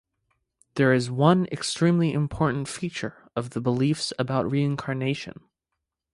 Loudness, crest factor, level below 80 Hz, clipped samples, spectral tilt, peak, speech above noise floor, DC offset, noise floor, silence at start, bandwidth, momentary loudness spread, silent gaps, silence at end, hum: -25 LUFS; 20 dB; -56 dBFS; under 0.1%; -6 dB/octave; -4 dBFS; 59 dB; under 0.1%; -83 dBFS; 0.75 s; 11.5 kHz; 12 LU; none; 0.85 s; none